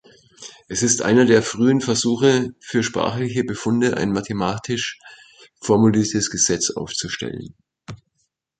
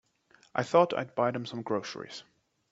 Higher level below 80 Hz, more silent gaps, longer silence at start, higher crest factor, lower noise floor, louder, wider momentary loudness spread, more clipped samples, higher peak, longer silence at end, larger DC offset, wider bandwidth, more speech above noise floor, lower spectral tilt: first, -52 dBFS vs -74 dBFS; neither; second, 0.4 s vs 0.55 s; about the same, 18 dB vs 22 dB; first, -72 dBFS vs -64 dBFS; first, -19 LUFS vs -30 LUFS; about the same, 18 LU vs 17 LU; neither; first, -2 dBFS vs -10 dBFS; first, 0.65 s vs 0.5 s; neither; first, 9.4 kHz vs 8 kHz; first, 52 dB vs 35 dB; second, -4 dB/octave vs -5.5 dB/octave